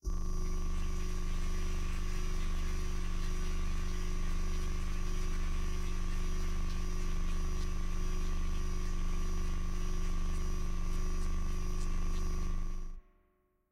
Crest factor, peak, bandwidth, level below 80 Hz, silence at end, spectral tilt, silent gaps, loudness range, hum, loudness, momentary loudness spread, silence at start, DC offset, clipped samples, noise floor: 8 dB; -24 dBFS; 12 kHz; -32 dBFS; 0.7 s; -5 dB/octave; none; 0 LU; 50 Hz at -50 dBFS; -40 LUFS; 1 LU; 0.05 s; under 0.1%; under 0.1%; -73 dBFS